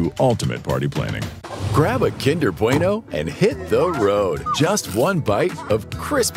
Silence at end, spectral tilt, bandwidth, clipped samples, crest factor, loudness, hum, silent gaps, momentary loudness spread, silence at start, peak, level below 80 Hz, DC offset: 0 s; -5.5 dB/octave; 16.5 kHz; under 0.1%; 18 dB; -20 LUFS; none; none; 6 LU; 0 s; -2 dBFS; -44 dBFS; under 0.1%